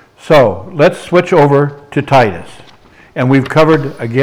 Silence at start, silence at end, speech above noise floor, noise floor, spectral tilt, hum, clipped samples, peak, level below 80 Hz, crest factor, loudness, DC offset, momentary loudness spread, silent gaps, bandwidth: 0.25 s; 0 s; 31 dB; -41 dBFS; -7 dB/octave; none; under 0.1%; 0 dBFS; -42 dBFS; 12 dB; -11 LUFS; under 0.1%; 8 LU; none; 13.5 kHz